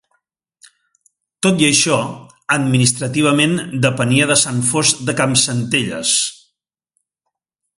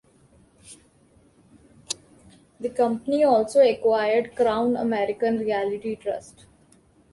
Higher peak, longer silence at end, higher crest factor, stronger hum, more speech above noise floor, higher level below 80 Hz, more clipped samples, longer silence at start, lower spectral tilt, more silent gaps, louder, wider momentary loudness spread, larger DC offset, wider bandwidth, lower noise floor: first, 0 dBFS vs -8 dBFS; first, 1.45 s vs 0.9 s; about the same, 18 dB vs 18 dB; neither; first, 63 dB vs 36 dB; first, -54 dBFS vs -62 dBFS; neither; first, 1.4 s vs 0.7 s; about the same, -3.5 dB/octave vs -4.5 dB/octave; neither; first, -15 LUFS vs -23 LUFS; second, 7 LU vs 15 LU; neither; about the same, 11.5 kHz vs 11.5 kHz; first, -78 dBFS vs -58 dBFS